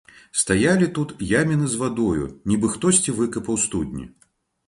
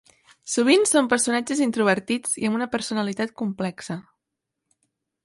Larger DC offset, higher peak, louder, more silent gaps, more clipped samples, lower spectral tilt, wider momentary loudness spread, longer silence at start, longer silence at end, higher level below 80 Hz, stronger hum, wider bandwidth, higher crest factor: neither; about the same, -4 dBFS vs -4 dBFS; about the same, -21 LUFS vs -22 LUFS; neither; neither; about the same, -4.5 dB/octave vs -3.5 dB/octave; second, 9 LU vs 13 LU; about the same, 0.35 s vs 0.45 s; second, 0.6 s vs 1.25 s; first, -46 dBFS vs -66 dBFS; neither; about the same, 11.5 kHz vs 11.5 kHz; about the same, 18 dB vs 20 dB